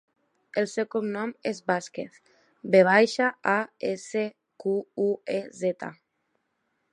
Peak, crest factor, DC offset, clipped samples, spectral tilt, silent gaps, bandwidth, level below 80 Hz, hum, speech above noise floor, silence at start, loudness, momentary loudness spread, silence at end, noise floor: -6 dBFS; 22 dB; under 0.1%; under 0.1%; -5 dB/octave; none; 11 kHz; -80 dBFS; none; 50 dB; 0.55 s; -26 LUFS; 16 LU; 1 s; -76 dBFS